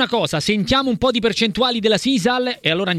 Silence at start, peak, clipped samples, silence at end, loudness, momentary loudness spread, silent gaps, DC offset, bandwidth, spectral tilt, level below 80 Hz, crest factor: 0 s; -2 dBFS; under 0.1%; 0 s; -18 LUFS; 2 LU; none; under 0.1%; 14.5 kHz; -4.5 dB/octave; -44 dBFS; 16 dB